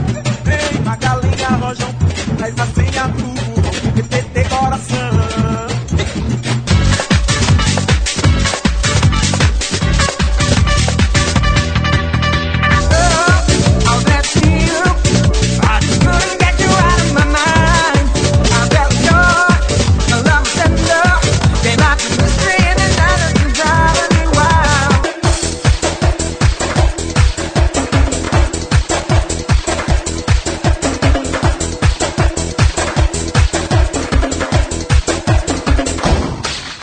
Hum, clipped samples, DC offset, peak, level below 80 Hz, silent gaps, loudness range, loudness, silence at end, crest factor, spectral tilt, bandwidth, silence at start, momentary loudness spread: none; under 0.1%; under 0.1%; 0 dBFS; -18 dBFS; none; 5 LU; -13 LUFS; 0 s; 12 dB; -4.5 dB/octave; 9.4 kHz; 0 s; 6 LU